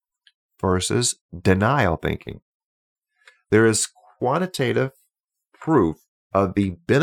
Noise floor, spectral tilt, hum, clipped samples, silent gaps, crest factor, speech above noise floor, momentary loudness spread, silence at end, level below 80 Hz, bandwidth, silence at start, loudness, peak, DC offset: -76 dBFS; -5 dB/octave; none; under 0.1%; 1.21-1.29 s, 2.42-2.96 s, 5.24-5.28 s, 6.08-6.30 s; 18 dB; 55 dB; 10 LU; 0 s; -48 dBFS; 17.5 kHz; 0.65 s; -22 LUFS; -4 dBFS; under 0.1%